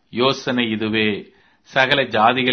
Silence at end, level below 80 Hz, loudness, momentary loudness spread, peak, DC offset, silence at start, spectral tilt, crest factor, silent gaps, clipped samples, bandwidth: 0 s; -58 dBFS; -18 LUFS; 6 LU; 0 dBFS; under 0.1%; 0.15 s; -5 dB/octave; 20 dB; none; under 0.1%; 6.6 kHz